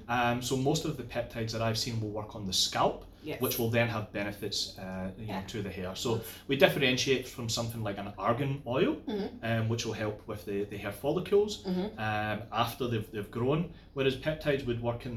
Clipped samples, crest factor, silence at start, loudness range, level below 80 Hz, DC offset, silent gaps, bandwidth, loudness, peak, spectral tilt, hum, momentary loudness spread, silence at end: under 0.1%; 24 dB; 0 s; 3 LU; -54 dBFS; under 0.1%; none; 17 kHz; -32 LUFS; -8 dBFS; -4.5 dB/octave; none; 9 LU; 0 s